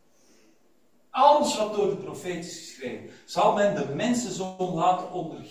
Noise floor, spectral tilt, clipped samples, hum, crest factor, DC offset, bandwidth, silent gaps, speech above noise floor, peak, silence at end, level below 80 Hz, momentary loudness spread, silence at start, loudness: -66 dBFS; -4.5 dB/octave; under 0.1%; none; 20 dB; under 0.1%; 16 kHz; none; 39 dB; -6 dBFS; 0 s; -66 dBFS; 17 LU; 1.15 s; -25 LUFS